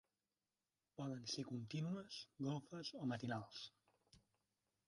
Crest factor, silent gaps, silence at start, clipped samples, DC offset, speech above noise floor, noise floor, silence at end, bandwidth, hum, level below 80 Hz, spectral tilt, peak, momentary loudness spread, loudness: 16 dB; none; 1 s; under 0.1%; under 0.1%; over 42 dB; under -90 dBFS; 0.7 s; 11 kHz; none; -84 dBFS; -5 dB/octave; -34 dBFS; 8 LU; -48 LUFS